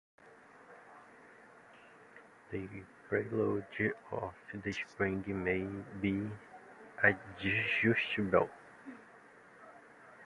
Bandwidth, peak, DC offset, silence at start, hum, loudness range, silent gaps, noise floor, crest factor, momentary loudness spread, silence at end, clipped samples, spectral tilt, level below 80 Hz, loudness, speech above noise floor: 11.5 kHz; -12 dBFS; under 0.1%; 0.25 s; none; 8 LU; none; -59 dBFS; 26 dB; 26 LU; 0 s; under 0.1%; -7 dB/octave; -62 dBFS; -35 LUFS; 24 dB